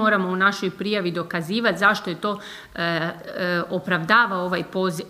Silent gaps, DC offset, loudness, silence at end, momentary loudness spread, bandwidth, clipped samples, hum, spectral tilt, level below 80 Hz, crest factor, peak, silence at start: none; under 0.1%; -22 LUFS; 0 s; 10 LU; 15.5 kHz; under 0.1%; none; -5 dB/octave; -62 dBFS; 20 dB; -2 dBFS; 0 s